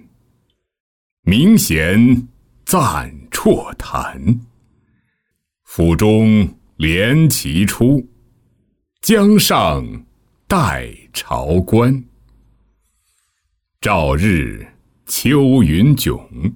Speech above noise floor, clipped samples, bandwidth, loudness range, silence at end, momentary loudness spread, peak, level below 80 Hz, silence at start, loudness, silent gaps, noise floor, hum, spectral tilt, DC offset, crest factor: 59 dB; under 0.1%; 19.5 kHz; 5 LU; 0 s; 13 LU; -2 dBFS; -34 dBFS; 1.25 s; -15 LUFS; none; -72 dBFS; none; -5.5 dB/octave; under 0.1%; 14 dB